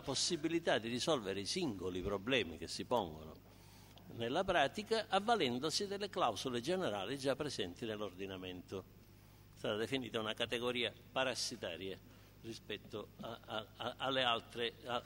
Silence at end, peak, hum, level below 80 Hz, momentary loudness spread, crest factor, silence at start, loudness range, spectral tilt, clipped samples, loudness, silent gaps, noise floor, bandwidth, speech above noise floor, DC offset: 0 s; -18 dBFS; 50 Hz at -65 dBFS; -66 dBFS; 14 LU; 22 dB; 0 s; 6 LU; -3.5 dB/octave; under 0.1%; -39 LUFS; none; -61 dBFS; 16 kHz; 22 dB; under 0.1%